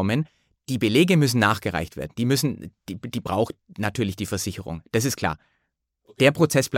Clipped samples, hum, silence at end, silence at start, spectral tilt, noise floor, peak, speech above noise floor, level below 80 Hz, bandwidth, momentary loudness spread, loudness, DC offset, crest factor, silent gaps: under 0.1%; none; 0 s; 0 s; -5 dB/octave; -76 dBFS; -4 dBFS; 53 dB; -52 dBFS; 17 kHz; 15 LU; -23 LUFS; under 0.1%; 20 dB; none